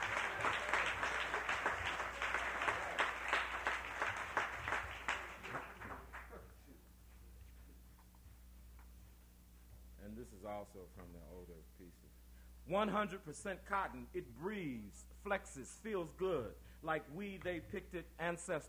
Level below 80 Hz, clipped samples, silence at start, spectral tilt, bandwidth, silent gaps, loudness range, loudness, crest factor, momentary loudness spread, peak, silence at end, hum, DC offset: -60 dBFS; under 0.1%; 0 s; -4 dB/octave; over 20 kHz; none; 19 LU; -41 LUFS; 24 dB; 23 LU; -20 dBFS; 0 s; none; under 0.1%